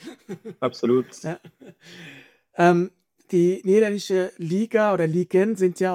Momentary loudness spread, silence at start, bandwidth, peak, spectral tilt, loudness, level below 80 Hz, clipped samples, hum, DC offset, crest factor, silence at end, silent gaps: 19 LU; 0.05 s; 14 kHz; -6 dBFS; -6.5 dB/octave; -22 LUFS; -74 dBFS; under 0.1%; none; under 0.1%; 16 dB; 0 s; none